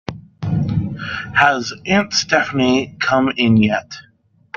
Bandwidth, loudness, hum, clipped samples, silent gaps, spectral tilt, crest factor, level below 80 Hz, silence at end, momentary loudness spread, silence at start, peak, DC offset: 7.2 kHz; -17 LUFS; none; under 0.1%; none; -5 dB/octave; 18 dB; -48 dBFS; 0.55 s; 12 LU; 0.1 s; 0 dBFS; under 0.1%